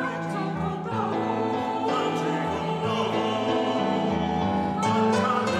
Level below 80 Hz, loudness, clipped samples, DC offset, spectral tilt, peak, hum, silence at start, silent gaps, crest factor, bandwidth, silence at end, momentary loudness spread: -54 dBFS; -26 LUFS; under 0.1%; under 0.1%; -6 dB/octave; -12 dBFS; none; 0 s; none; 14 dB; 12.5 kHz; 0 s; 6 LU